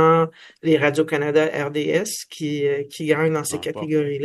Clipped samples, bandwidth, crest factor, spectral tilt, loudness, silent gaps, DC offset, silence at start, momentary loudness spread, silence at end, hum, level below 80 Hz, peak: under 0.1%; 12.5 kHz; 18 dB; -5 dB/octave; -21 LUFS; none; under 0.1%; 0 s; 9 LU; 0 s; none; -66 dBFS; -2 dBFS